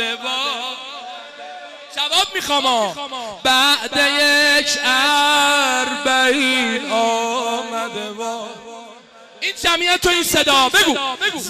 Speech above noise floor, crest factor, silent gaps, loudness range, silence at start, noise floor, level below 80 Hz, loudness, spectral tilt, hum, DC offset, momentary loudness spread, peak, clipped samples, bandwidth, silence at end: 26 dB; 12 dB; none; 6 LU; 0 s; -43 dBFS; -52 dBFS; -16 LUFS; -0.5 dB/octave; none; under 0.1%; 17 LU; -6 dBFS; under 0.1%; 15.5 kHz; 0 s